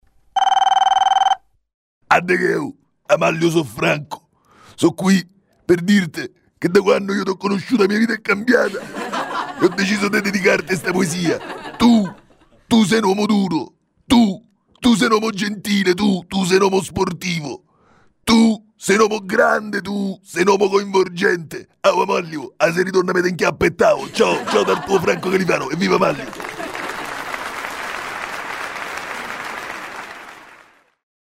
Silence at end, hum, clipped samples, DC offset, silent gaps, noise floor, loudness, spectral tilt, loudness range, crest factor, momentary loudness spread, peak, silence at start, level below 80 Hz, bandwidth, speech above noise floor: 0.9 s; none; under 0.1%; under 0.1%; 1.74-2.01 s; -54 dBFS; -18 LUFS; -5 dB/octave; 5 LU; 16 dB; 12 LU; -2 dBFS; 0.35 s; -50 dBFS; 16 kHz; 37 dB